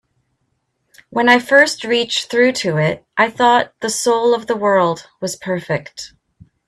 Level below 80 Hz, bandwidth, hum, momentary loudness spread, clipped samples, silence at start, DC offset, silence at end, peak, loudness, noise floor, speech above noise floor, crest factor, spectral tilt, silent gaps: -60 dBFS; 14 kHz; none; 13 LU; under 0.1%; 1.1 s; under 0.1%; 0.6 s; 0 dBFS; -16 LUFS; -69 dBFS; 53 dB; 18 dB; -3.5 dB/octave; none